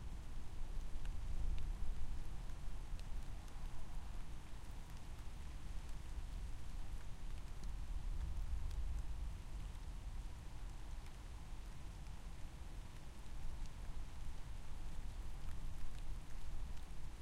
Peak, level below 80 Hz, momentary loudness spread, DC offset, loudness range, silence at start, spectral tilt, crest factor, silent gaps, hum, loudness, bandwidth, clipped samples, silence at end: -28 dBFS; -46 dBFS; 7 LU; under 0.1%; 4 LU; 0 s; -5.5 dB/octave; 14 dB; none; none; -52 LUFS; 12 kHz; under 0.1%; 0 s